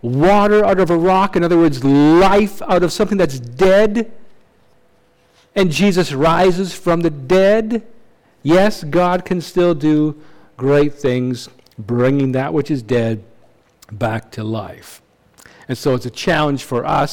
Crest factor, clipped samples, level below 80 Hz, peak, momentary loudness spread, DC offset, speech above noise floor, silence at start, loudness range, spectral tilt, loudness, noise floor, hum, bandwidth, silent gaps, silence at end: 8 dB; under 0.1%; -40 dBFS; -6 dBFS; 12 LU; under 0.1%; 41 dB; 0.05 s; 8 LU; -6.5 dB/octave; -15 LUFS; -55 dBFS; none; 17.5 kHz; none; 0 s